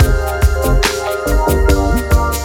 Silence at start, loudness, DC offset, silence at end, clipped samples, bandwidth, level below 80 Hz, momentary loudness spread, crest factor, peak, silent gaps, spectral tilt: 0 s; -15 LUFS; under 0.1%; 0 s; under 0.1%; 18 kHz; -16 dBFS; 2 LU; 12 dB; 0 dBFS; none; -5 dB/octave